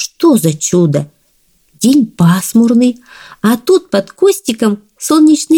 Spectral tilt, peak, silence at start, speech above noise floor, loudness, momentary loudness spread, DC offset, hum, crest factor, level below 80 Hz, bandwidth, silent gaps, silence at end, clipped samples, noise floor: -5.5 dB/octave; 0 dBFS; 0 s; 44 dB; -11 LUFS; 8 LU; under 0.1%; none; 10 dB; -54 dBFS; 19 kHz; none; 0 s; under 0.1%; -55 dBFS